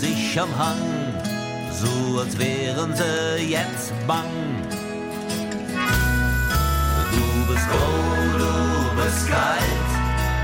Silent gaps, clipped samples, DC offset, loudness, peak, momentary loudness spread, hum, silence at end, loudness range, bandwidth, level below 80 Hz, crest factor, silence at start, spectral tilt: none; under 0.1%; under 0.1%; -22 LUFS; -8 dBFS; 7 LU; none; 0 s; 3 LU; 17 kHz; -30 dBFS; 14 dB; 0 s; -5 dB/octave